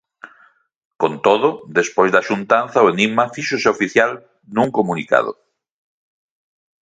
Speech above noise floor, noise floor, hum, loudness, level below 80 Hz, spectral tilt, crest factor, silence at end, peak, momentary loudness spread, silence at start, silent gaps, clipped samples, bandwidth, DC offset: 38 dB; -55 dBFS; none; -17 LUFS; -62 dBFS; -4.5 dB/octave; 18 dB; 1.5 s; 0 dBFS; 7 LU; 0.25 s; 0.76-0.91 s; under 0.1%; 9.2 kHz; under 0.1%